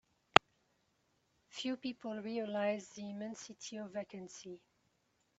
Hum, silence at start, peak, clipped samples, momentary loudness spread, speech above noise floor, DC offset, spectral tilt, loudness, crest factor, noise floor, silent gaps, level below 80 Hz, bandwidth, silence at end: none; 1.55 s; -2 dBFS; under 0.1%; 21 LU; 36 dB; under 0.1%; -3.5 dB/octave; -37 LUFS; 38 dB; -78 dBFS; none; -72 dBFS; 8.2 kHz; 0.8 s